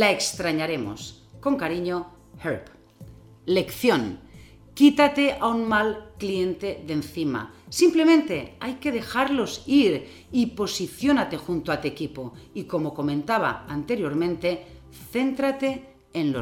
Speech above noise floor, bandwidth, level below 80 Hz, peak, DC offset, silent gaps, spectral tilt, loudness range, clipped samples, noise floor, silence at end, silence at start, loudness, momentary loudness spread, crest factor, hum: 24 dB; 17 kHz; -54 dBFS; -4 dBFS; under 0.1%; none; -4.5 dB/octave; 5 LU; under 0.1%; -48 dBFS; 0 s; 0 s; -24 LUFS; 15 LU; 20 dB; none